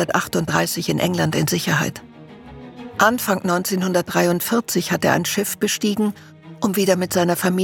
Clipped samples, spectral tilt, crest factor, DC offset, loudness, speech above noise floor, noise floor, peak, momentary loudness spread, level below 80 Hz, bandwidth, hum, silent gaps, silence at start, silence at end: under 0.1%; -4.5 dB/octave; 18 dB; under 0.1%; -20 LUFS; 21 dB; -40 dBFS; -2 dBFS; 7 LU; -56 dBFS; 18 kHz; none; none; 0 s; 0 s